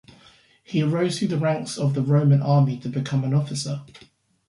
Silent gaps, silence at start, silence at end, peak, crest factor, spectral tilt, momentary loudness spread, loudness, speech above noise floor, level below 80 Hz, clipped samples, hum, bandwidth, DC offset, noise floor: none; 0.7 s; 0.65 s; -6 dBFS; 16 dB; -7 dB/octave; 10 LU; -22 LUFS; 33 dB; -62 dBFS; under 0.1%; none; 11.5 kHz; under 0.1%; -54 dBFS